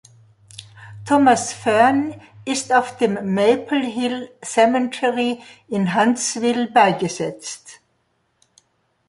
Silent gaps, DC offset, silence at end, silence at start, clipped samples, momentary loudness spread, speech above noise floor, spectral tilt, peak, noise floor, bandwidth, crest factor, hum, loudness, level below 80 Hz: none; under 0.1%; 1.35 s; 0.6 s; under 0.1%; 17 LU; 48 dB; -4 dB/octave; -2 dBFS; -67 dBFS; 11.5 kHz; 18 dB; none; -19 LUFS; -64 dBFS